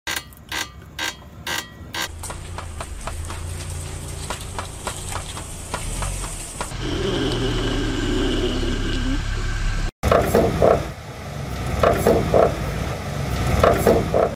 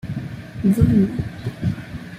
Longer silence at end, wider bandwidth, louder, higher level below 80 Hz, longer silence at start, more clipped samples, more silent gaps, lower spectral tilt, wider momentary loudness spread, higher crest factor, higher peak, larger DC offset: about the same, 0 s vs 0 s; about the same, 16.5 kHz vs 15.5 kHz; about the same, -23 LUFS vs -21 LUFS; first, -30 dBFS vs -38 dBFS; about the same, 0.05 s vs 0.05 s; neither; first, 9.92-10.02 s vs none; second, -5 dB/octave vs -8.5 dB/octave; about the same, 14 LU vs 15 LU; about the same, 22 dB vs 18 dB; about the same, 0 dBFS vs -2 dBFS; neither